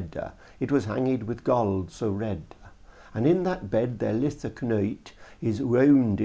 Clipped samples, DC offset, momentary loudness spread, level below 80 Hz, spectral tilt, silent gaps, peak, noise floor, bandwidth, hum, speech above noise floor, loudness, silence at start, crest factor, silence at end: under 0.1%; under 0.1%; 13 LU; -50 dBFS; -8.5 dB/octave; none; -10 dBFS; -49 dBFS; 8 kHz; none; 23 dB; -26 LUFS; 0 s; 16 dB; 0 s